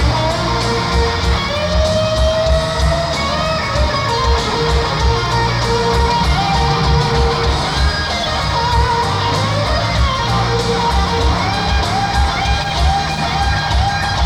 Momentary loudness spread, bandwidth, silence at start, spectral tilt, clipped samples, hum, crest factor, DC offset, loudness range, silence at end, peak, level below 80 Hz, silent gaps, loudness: 2 LU; 12 kHz; 0 s; -5 dB/octave; under 0.1%; none; 14 dB; under 0.1%; 1 LU; 0 s; -2 dBFS; -20 dBFS; none; -15 LUFS